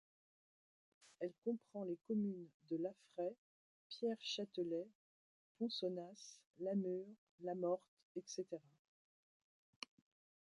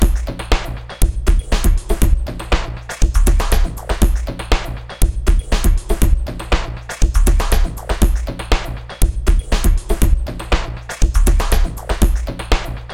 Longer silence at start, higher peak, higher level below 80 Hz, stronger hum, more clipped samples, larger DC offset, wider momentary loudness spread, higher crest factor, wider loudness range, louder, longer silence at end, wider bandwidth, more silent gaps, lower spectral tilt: first, 1.05 s vs 0 s; second, -28 dBFS vs 0 dBFS; second, under -90 dBFS vs -16 dBFS; neither; neither; neither; first, 14 LU vs 5 LU; about the same, 18 dB vs 14 dB; about the same, 2 LU vs 1 LU; second, -46 LUFS vs -19 LUFS; first, 1.9 s vs 0 s; second, 11 kHz vs 17 kHz; first, 1.38-1.42 s, 2.54-2.60 s, 3.38-3.90 s, 4.95-5.55 s, 6.46-6.54 s, 7.18-7.38 s, 7.88-7.97 s, 8.03-8.15 s vs none; about the same, -5.5 dB/octave vs -5 dB/octave